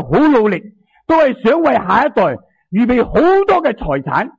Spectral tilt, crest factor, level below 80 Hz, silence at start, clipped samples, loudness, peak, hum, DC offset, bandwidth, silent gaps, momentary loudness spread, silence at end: -8 dB/octave; 12 dB; -38 dBFS; 0 s; under 0.1%; -13 LUFS; -2 dBFS; none; under 0.1%; 7.6 kHz; none; 9 LU; 0.1 s